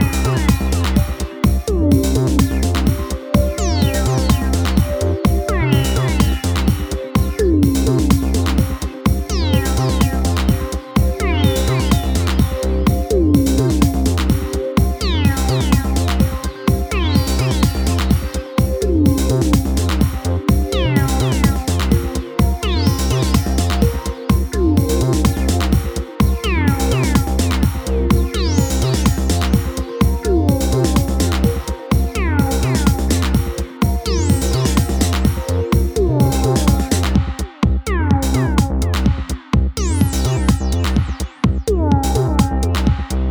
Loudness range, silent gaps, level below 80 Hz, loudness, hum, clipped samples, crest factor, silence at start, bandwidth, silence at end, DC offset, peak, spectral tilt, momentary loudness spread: 1 LU; none; -20 dBFS; -17 LUFS; none; under 0.1%; 16 dB; 0 s; over 20 kHz; 0 s; under 0.1%; 0 dBFS; -6 dB/octave; 4 LU